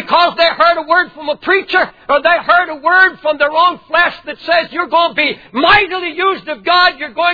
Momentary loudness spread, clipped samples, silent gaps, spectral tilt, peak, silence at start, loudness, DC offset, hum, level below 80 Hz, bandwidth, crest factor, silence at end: 6 LU; under 0.1%; none; -4.5 dB/octave; 0 dBFS; 0 s; -12 LUFS; 0.2%; none; -46 dBFS; 5 kHz; 12 dB; 0 s